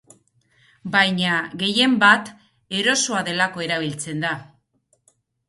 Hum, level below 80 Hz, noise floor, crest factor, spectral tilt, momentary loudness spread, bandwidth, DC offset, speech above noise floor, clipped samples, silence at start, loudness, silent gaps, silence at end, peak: none; -66 dBFS; -66 dBFS; 22 dB; -3 dB/octave; 12 LU; 11.5 kHz; under 0.1%; 46 dB; under 0.1%; 0.85 s; -19 LUFS; none; 1.05 s; -2 dBFS